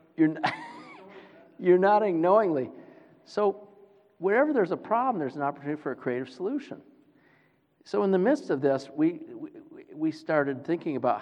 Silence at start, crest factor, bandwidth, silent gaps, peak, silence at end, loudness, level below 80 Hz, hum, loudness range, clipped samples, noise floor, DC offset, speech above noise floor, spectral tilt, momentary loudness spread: 0.2 s; 18 dB; 9 kHz; none; -10 dBFS; 0 s; -27 LUFS; -84 dBFS; none; 5 LU; under 0.1%; -65 dBFS; under 0.1%; 39 dB; -7.5 dB/octave; 20 LU